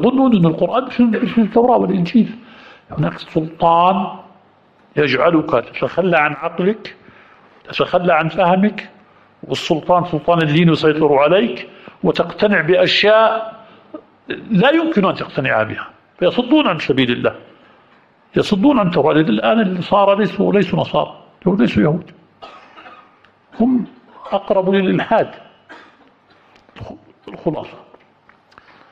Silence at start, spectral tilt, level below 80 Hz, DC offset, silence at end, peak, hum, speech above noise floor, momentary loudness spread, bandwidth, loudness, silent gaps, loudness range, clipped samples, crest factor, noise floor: 0 s; -7.5 dB/octave; -50 dBFS; under 0.1%; 1.15 s; -2 dBFS; none; 37 dB; 14 LU; 8.2 kHz; -15 LUFS; none; 5 LU; under 0.1%; 14 dB; -52 dBFS